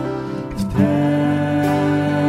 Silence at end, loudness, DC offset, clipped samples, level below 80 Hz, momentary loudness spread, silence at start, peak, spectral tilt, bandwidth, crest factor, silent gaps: 0 s; -19 LUFS; under 0.1%; under 0.1%; -42 dBFS; 8 LU; 0 s; -4 dBFS; -8 dB/octave; 13.5 kHz; 14 dB; none